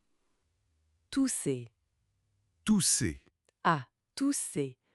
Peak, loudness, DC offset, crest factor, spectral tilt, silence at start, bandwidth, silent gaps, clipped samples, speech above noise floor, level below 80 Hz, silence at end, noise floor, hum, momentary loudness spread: -12 dBFS; -31 LUFS; under 0.1%; 22 dB; -3.5 dB/octave; 1.1 s; 12 kHz; none; under 0.1%; 47 dB; -60 dBFS; 0.2 s; -78 dBFS; none; 12 LU